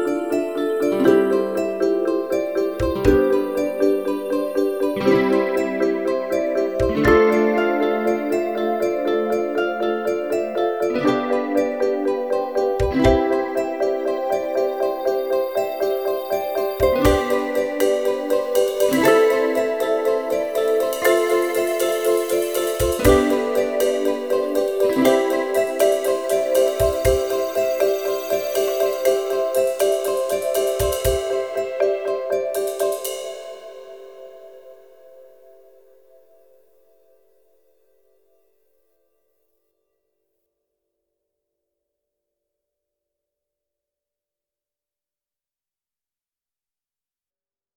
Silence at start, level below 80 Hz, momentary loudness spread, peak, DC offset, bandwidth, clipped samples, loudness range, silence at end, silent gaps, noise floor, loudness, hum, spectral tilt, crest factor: 0 s; -40 dBFS; 6 LU; -2 dBFS; 0.2%; 19.5 kHz; under 0.1%; 4 LU; 12.55 s; none; under -90 dBFS; -20 LUFS; none; -5 dB/octave; 20 dB